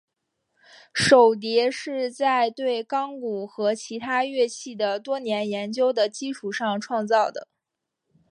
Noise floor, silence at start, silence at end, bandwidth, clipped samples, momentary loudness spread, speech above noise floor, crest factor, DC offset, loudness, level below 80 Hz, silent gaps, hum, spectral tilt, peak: -83 dBFS; 0.95 s; 0.85 s; 11.5 kHz; under 0.1%; 12 LU; 60 dB; 20 dB; under 0.1%; -24 LUFS; -66 dBFS; none; none; -3.5 dB/octave; -4 dBFS